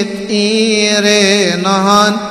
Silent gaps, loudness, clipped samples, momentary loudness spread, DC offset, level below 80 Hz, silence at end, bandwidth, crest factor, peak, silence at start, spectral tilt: none; -10 LUFS; under 0.1%; 4 LU; under 0.1%; -52 dBFS; 0 s; 15 kHz; 12 dB; 0 dBFS; 0 s; -3.5 dB/octave